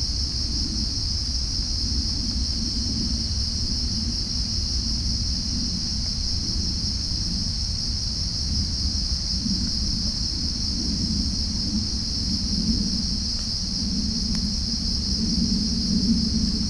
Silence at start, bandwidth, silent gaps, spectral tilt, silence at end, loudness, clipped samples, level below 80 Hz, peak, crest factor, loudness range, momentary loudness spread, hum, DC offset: 0 s; 10.5 kHz; none; -3.5 dB/octave; 0 s; -24 LUFS; under 0.1%; -30 dBFS; -10 dBFS; 16 dB; 1 LU; 2 LU; none; under 0.1%